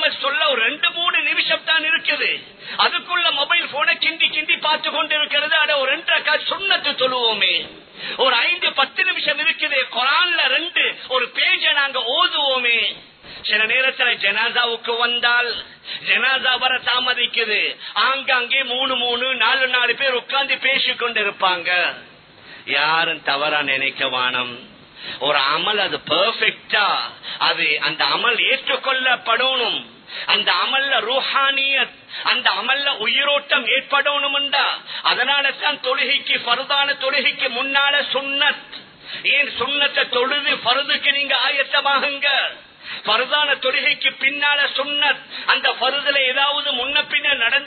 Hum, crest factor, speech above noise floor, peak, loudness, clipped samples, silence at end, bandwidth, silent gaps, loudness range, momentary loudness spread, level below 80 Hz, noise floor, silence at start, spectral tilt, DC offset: none; 18 dB; 24 dB; 0 dBFS; -17 LUFS; under 0.1%; 0 s; 4.6 kHz; none; 2 LU; 5 LU; -68 dBFS; -43 dBFS; 0 s; -6.5 dB/octave; under 0.1%